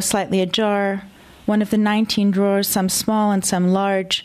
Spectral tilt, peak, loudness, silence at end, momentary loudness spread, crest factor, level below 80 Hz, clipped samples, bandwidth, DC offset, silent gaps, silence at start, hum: -4.5 dB/octave; -4 dBFS; -18 LUFS; 0 s; 4 LU; 14 dB; -54 dBFS; under 0.1%; 15 kHz; under 0.1%; none; 0 s; none